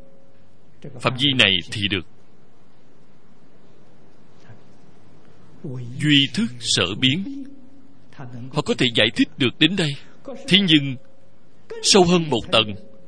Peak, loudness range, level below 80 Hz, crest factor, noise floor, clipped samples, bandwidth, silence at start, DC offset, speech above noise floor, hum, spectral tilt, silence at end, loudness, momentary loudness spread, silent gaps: 0 dBFS; 6 LU; -54 dBFS; 22 dB; -55 dBFS; under 0.1%; 10.5 kHz; 0.85 s; 2%; 35 dB; none; -4 dB/octave; 0.3 s; -18 LUFS; 21 LU; none